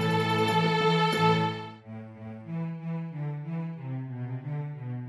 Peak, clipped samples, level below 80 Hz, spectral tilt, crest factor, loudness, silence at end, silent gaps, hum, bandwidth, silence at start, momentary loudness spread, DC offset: -12 dBFS; under 0.1%; -68 dBFS; -6.5 dB/octave; 16 dB; -29 LUFS; 0 s; none; none; 12.5 kHz; 0 s; 18 LU; under 0.1%